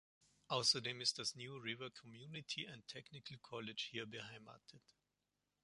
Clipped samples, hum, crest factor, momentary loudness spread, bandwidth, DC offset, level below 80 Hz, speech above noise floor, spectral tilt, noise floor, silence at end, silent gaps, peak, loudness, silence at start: under 0.1%; 50 Hz at -80 dBFS; 24 dB; 18 LU; 11.5 kHz; under 0.1%; -84 dBFS; 43 dB; -2 dB/octave; -89 dBFS; 0.85 s; none; -22 dBFS; -43 LUFS; 0.5 s